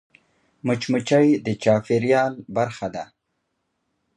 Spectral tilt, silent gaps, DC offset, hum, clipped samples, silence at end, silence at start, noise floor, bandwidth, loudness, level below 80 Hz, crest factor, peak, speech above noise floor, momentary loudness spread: -6.5 dB/octave; none; under 0.1%; none; under 0.1%; 1.1 s; 0.65 s; -75 dBFS; 10.5 kHz; -21 LUFS; -62 dBFS; 18 dB; -4 dBFS; 54 dB; 13 LU